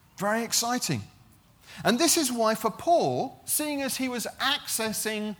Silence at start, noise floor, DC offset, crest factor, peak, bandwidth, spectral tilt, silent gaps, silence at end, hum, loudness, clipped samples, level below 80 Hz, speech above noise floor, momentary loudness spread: 0.2 s; -57 dBFS; under 0.1%; 20 dB; -8 dBFS; over 20 kHz; -2.5 dB/octave; none; 0.05 s; none; -26 LUFS; under 0.1%; -66 dBFS; 30 dB; 7 LU